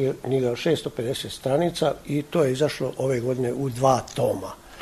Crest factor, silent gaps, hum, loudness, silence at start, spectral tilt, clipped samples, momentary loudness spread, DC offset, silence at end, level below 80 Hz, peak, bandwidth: 18 dB; none; none; -25 LUFS; 0 s; -6 dB/octave; under 0.1%; 7 LU; under 0.1%; 0 s; -54 dBFS; -6 dBFS; 13.5 kHz